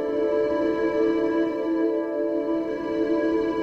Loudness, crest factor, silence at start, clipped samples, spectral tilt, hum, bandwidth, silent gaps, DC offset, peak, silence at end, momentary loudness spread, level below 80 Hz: -24 LUFS; 12 dB; 0 s; under 0.1%; -7 dB/octave; none; 6.6 kHz; none; under 0.1%; -12 dBFS; 0 s; 3 LU; -56 dBFS